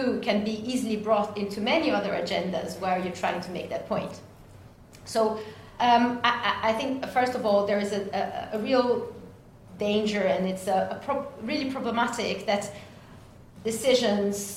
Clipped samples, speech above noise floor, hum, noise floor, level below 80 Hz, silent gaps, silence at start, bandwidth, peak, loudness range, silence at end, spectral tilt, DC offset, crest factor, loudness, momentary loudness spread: under 0.1%; 23 dB; none; -49 dBFS; -60 dBFS; none; 0 s; 16 kHz; -6 dBFS; 5 LU; 0 s; -4.5 dB/octave; under 0.1%; 22 dB; -27 LUFS; 10 LU